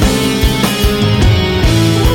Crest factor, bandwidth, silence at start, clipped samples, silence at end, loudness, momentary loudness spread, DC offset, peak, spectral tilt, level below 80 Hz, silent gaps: 10 dB; 17.5 kHz; 0 s; under 0.1%; 0 s; -12 LUFS; 2 LU; under 0.1%; 0 dBFS; -5 dB/octave; -16 dBFS; none